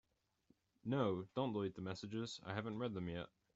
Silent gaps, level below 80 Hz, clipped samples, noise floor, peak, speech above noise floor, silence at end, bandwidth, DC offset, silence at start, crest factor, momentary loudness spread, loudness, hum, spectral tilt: none; -76 dBFS; under 0.1%; -78 dBFS; -26 dBFS; 35 dB; 0.3 s; 8 kHz; under 0.1%; 0.85 s; 18 dB; 8 LU; -44 LUFS; none; -6 dB/octave